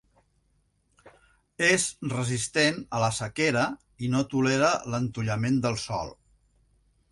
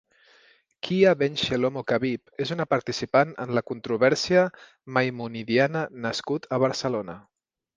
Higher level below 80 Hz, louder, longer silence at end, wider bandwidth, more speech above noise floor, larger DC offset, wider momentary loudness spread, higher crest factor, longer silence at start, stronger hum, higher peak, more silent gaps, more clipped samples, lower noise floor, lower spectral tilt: first, -56 dBFS vs -62 dBFS; about the same, -26 LUFS vs -25 LUFS; first, 1 s vs 0.6 s; first, 11.5 kHz vs 9.6 kHz; first, 43 dB vs 35 dB; neither; about the same, 8 LU vs 10 LU; about the same, 20 dB vs 20 dB; first, 1.05 s vs 0.85 s; neither; about the same, -8 dBFS vs -6 dBFS; neither; neither; first, -70 dBFS vs -60 dBFS; about the same, -4.5 dB/octave vs -5.5 dB/octave